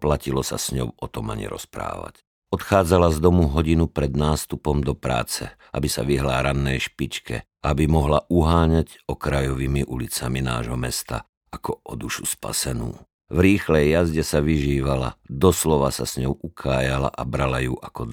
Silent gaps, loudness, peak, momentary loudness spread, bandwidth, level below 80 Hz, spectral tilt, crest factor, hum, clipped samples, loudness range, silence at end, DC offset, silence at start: 2.27-2.42 s, 11.29-11.41 s, 13.14-13.19 s; -23 LUFS; -4 dBFS; 13 LU; 19.5 kHz; -32 dBFS; -5.5 dB/octave; 18 dB; none; under 0.1%; 5 LU; 0 s; under 0.1%; 0 s